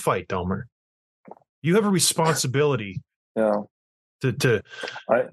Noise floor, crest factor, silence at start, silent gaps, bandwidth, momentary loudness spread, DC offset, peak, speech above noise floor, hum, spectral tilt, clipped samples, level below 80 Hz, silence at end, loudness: under -90 dBFS; 18 dB; 0 s; 0.72-1.24 s, 1.49-1.62 s, 3.16-3.35 s, 3.71-4.19 s; 12.5 kHz; 14 LU; under 0.1%; -6 dBFS; over 67 dB; none; -4.5 dB/octave; under 0.1%; -58 dBFS; 0.05 s; -23 LUFS